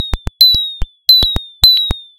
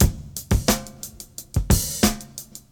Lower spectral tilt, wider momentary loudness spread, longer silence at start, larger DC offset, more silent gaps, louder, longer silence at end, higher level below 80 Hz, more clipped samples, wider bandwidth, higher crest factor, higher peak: second, -2.5 dB/octave vs -4.5 dB/octave; second, 9 LU vs 16 LU; about the same, 0 s vs 0 s; neither; neither; first, -9 LUFS vs -22 LUFS; about the same, 0.15 s vs 0.1 s; about the same, -24 dBFS vs -28 dBFS; first, 0.3% vs under 0.1%; about the same, over 20 kHz vs over 20 kHz; second, 12 dB vs 22 dB; about the same, 0 dBFS vs 0 dBFS